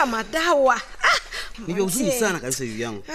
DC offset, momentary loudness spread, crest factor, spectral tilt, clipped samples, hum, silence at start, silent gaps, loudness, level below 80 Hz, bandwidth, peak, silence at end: under 0.1%; 11 LU; 18 dB; -3 dB/octave; under 0.1%; none; 0 s; none; -22 LUFS; -44 dBFS; 14 kHz; -4 dBFS; 0 s